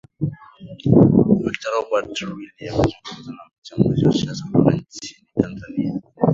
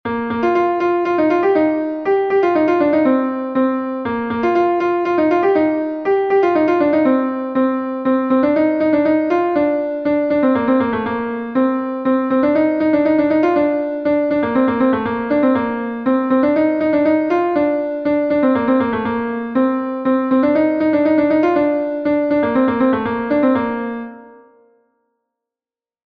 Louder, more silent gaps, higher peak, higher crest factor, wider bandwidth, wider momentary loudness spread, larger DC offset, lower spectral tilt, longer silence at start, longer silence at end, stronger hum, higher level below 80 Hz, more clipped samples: second, -20 LUFS vs -16 LUFS; first, 3.58-3.62 s vs none; first, 0 dBFS vs -4 dBFS; first, 20 dB vs 12 dB; first, 7.8 kHz vs 6.2 kHz; first, 20 LU vs 5 LU; neither; about the same, -7.5 dB/octave vs -8 dB/octave; first, 0.2 s vs 0.05 s; second, 0 s vs 1.75 s; neither; first, -44 dBFS vs -52 dBFS; neither